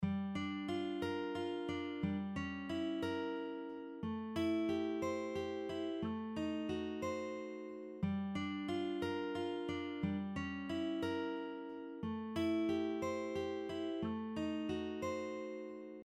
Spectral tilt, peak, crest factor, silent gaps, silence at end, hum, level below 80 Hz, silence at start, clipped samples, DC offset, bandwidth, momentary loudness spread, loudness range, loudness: -6.5 dB/octave; -26 dBFS; 14 dB; none; 0 s; none; -68 dBFS; 0 s; under 0.1%; under 0.1%; 13 kHz; 7 LU; 2 LU; -41 LUFS